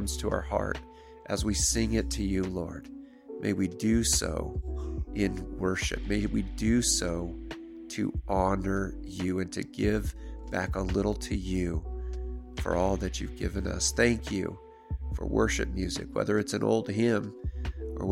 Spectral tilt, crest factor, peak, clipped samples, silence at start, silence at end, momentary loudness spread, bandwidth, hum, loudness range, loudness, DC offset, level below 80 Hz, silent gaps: -4.5 dB/octave; 20 dB; -10 dBFS; under 0.1%; 0 s; 0 s; 13 LU; 16.5 kHz; none; 3 LU; -30 LUFS; under 0.1%; -38 dBFS; none